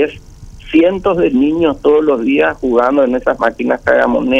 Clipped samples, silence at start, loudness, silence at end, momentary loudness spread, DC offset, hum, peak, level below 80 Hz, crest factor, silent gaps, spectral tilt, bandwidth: under 0.1%; 0 s; -13 LUFS; 0 s; 4 LU; under 0.1%; none; 0 dBFS; -38 dBFS; 12 dB; none; -7 dB/octave; 8.2 kHz